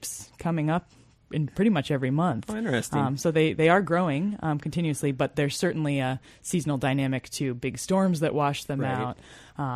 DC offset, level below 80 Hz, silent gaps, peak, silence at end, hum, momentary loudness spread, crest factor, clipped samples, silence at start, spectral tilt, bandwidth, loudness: under 0.1%; -56 dBFS; none; -8 dBFS; 0 s; none; 8 LU; 18 dB; under 0.1%; 0 s; -6 dB/octave; 13.5 kHz; -27 LUFS